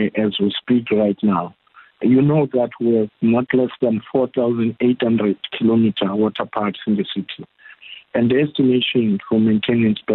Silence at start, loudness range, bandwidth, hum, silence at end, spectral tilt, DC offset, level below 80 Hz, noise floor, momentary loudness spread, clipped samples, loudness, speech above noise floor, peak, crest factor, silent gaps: 0 s; 2 LU; 4.2 kHz; none; 0 s; -11 dB/octave; under 0.1%; -56 dBFS; -41 dBFS; 7 LU; under 0.1%; -18 LUFS; 23 dB; -6 dBFS; 12 dB; none